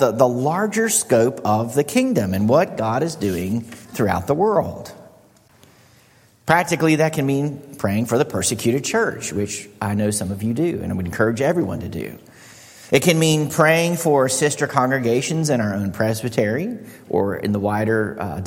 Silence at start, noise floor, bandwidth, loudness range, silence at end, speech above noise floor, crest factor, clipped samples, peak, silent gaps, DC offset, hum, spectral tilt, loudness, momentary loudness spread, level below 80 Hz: 0 s; -53 dBFS; 16.5 kHz; 5 LU; 0 s; 34 dB; 20 dB; under 0.1%; 0 dBFS; none; under 0.1%; none; -5 dB/octave; -20 LUFS; 9 LU; -54 dBFS